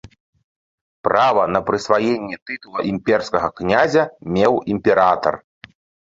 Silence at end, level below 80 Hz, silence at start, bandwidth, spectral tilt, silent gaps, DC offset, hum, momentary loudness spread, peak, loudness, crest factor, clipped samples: 0.75 s; -50 dBFS; 1.05 s; 7.8 kHz; -6 dB/octave; 2.42-2.46 s; under 0.1%; none; 10 LU; -2 dBFS; -18 LUFS; 18 dB; under 0.1%